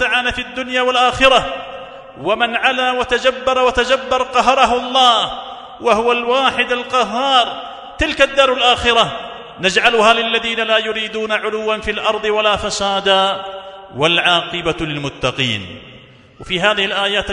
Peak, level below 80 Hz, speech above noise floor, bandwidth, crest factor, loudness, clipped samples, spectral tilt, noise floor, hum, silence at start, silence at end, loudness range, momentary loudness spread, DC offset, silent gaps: 0 dBFS; -40 dBFS; 26 dB; 12 kHz; 16 dB; -15 LUFS; under 0.1%; -3 dB/octave; -42 dBFS; none; 0 s; 0 s; 3 LU; 13 LU; under 0.1%; none